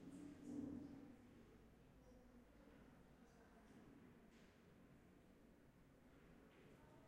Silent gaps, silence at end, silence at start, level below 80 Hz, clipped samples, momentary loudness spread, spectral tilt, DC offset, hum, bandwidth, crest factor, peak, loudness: none; 0 s; 0 s; -76 dBFS; under 0.1%; 15 LU; -6.5 dB/octave; under 0.1%; none; 13 kHz; 22 dB; -40 dBFS; -63 LUFS